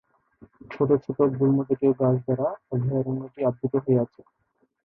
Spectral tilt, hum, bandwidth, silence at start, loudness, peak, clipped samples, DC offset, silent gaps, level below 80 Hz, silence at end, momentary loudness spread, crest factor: -12.5 dB/octave; none; 3.4 kHz; 0.7 s; -24 LUFS; -8 dBFS; under 0.1%; under 0.1%; none; -62 dBFS; 0.8 s; 6 LU; 18 dB